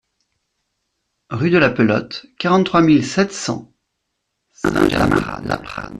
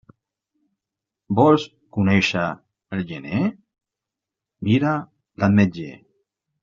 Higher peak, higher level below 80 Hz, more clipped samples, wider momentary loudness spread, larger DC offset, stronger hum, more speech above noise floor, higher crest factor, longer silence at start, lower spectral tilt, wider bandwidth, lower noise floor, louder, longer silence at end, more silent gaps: about the same, -2 dBFS vs -4 dBFS; first, -42 dBFS vs -56 dBFS; neither; second, 11 LU vs 14 LU; neither; neither; second, 58 dB vs 67 dB; about the same, 16 dB vs 20 dB; about the same, 1.3 s vs 1.3 s; about the same, -6 dB/octave vs -5.5 dB/octave; first, 13.5 kHz vs 7.4 kHz; second, -74 dBFS vs -86 dBFS; first, -17 LUFS vs -21 LUFS; second, 0 s vs 0.65 s; neither